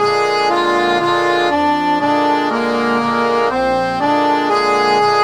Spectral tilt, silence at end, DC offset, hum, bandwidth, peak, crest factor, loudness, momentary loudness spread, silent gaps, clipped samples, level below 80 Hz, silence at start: -4.5 dB/octave; 0 s; 0.3%; none; 20 kHz; -2 dBFS; 12 dB; -15 LUFS; 3 LU; none; under 0.1%; -50 dBFS; 0 s